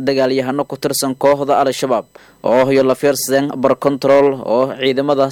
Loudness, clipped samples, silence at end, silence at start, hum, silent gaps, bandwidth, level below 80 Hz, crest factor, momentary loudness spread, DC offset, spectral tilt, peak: -15 LUFS; under 0.1%; 0 s; 0 s; none; none; 17.5 kHz; -56 dBFS; 14 dB; 6 LU; under 0.1%; -4.5 dB/octave; 0 dBFS